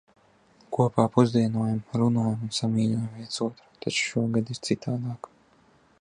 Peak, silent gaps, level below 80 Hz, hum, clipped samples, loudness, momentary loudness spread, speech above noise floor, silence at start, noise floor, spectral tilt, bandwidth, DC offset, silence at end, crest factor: -6 dBFS; none; -62 dBFS; none; under 0.1%; -26 LUFS; 11 LU; 35 dB; 0.7 s; -60 dBFS; -6 dB/octave; 11 kHz; under 0.1%; 0.85 s; 22 dB